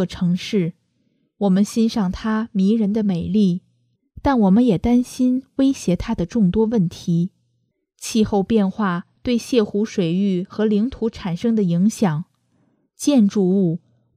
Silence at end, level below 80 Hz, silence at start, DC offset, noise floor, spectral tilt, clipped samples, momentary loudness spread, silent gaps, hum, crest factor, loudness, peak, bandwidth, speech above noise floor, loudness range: 0.4 s; -44 dBFS; 0 s; under 0.1%; -69 dBFS; -7 dB/octave; under 0.1%; 7 LU; none; none; 16 dB; -20 LUFS; -4 dBFS; 14 kHz; 51 dB; 2 LU